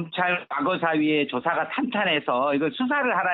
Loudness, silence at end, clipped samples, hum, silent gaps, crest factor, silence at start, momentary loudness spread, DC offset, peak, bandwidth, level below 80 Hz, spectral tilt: -24 LUFS; 0 s; under 0.1%; none; none; 14 dB; 0 s; 3 LU; under 0.1%; -10 dBFS; 4.5 kHz; -72 dBFS; -8.5 dB/octave